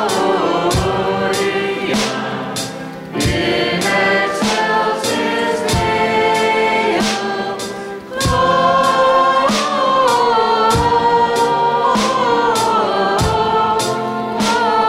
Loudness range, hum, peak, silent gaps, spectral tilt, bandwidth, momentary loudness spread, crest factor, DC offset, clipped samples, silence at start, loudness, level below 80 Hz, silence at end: 4 LU; none; -2 dBFS; none; -4 dB/octave; 16 kHz; 8 LU; 12 dB; under 0.1%; under 0.1%; 0 s; -15 LUFS; -36 dBFS; 0 s